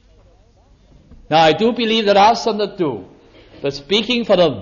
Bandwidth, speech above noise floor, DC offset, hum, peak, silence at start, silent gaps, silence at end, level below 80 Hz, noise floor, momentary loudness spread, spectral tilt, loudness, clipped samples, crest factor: 7.2 kHz; 35 dB; under 0.1%; none; -2 dBFS; 1.3 s; none; 0 s; -48 dBFS; -50 dBFS; 13 LU; -5 dB/octave; -16 LUFS; under 0.1%; 14 dB